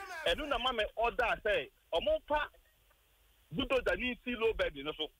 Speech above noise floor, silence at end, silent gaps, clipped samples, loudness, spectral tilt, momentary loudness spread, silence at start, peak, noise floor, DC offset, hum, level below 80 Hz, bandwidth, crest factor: 35 dB; 0.1 s; none; under 0.1%; -34 LUFS; -4 dB/octave; 6 LU; 0 s; -22 dBFS; -69 dBFS; under 0.1%; none; -52 dBFS; 16 kHz; 14 dB